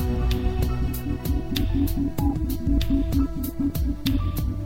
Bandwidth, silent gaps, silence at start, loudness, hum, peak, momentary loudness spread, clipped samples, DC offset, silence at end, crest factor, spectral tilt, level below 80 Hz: 16.5 kHz; none; 0 s; -26 LUFS; none; -8 dBFS; 4 LU; under 0.1%; under 0.1%; 0 s; 14 dB; -7 dB/octave; -26 dBFS